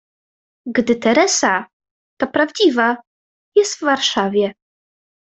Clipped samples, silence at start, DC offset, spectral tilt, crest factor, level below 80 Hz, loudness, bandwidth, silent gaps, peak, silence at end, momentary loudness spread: under 0.1%; 0.65 s; under 0.1%; -2.5 dB/octave; 16 dB; -60 dBFS; -17 LUFS; 8.4 kHz; 1.73-1.80 s, 1.91-2.17 s, 3.07-3.52 s; -2 dBFS; 0.85 s; 9 LU